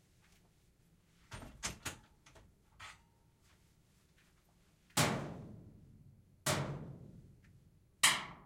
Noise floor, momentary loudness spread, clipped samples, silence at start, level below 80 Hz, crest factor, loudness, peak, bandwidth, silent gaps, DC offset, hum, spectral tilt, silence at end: -70 dBFS; 25 LU; under 0.1%; 1.3 s; -66 dBFS; 28 dB; -36 LUFS; -14 dBFS; 16 kHz; none; under 0.1%; none; -2.5 dB/octave; 0 s